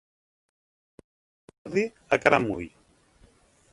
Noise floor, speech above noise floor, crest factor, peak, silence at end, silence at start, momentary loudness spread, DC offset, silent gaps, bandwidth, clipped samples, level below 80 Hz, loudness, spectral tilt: -60 dBFS; 35 dB; 28 dB; -2 dBFS; 1.05 s; 1.65 s; 19 LU; under 0.1%; none; 11.5 kHz; under 0.1%; -60 dBFS; -25 LUFS; -5.5 dB/octave